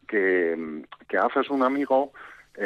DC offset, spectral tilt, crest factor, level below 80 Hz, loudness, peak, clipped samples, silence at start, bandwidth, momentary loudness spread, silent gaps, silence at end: under 0.1%; -6.5 dB/octave; 14 dB; -70 dBFS; -24 LUFS; -12 dBFS; under 0.1%; 0.1 s; 6.4 kHz; 14 LU; none; 0 s